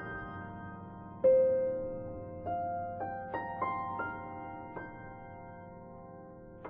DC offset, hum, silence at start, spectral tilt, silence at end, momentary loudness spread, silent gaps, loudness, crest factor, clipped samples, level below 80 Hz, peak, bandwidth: under 0.1%; none; 0 s; -6.5 dB/octave; 0 s; 22 LU; none; -35 LUFS; 18 dB; under 0.1%; -60 dBFS; -18 dBFS; 3.4 kHz